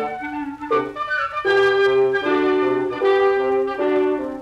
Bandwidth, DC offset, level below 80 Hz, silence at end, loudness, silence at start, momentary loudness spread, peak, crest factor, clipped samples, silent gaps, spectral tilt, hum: 7.2 kHz; under 0.1%; -56 dBFS; 0 s; -19 LUFS; 0 s; 7 LU; -6 dBFS; 12 dB; under 0.1%; none; -5.5 dB/octave; none